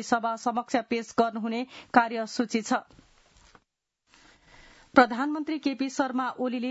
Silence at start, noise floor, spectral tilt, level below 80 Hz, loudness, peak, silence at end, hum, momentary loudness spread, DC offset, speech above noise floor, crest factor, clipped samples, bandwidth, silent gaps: 0 s; -77 dBFS; -4 dB/octave; -66 dBFS; -27 LUFS; -4 dBFS; 0 s; none; 8 LU; under 0.1%; 50 dB; 26 dB; under 0.1%; 8 kHz; none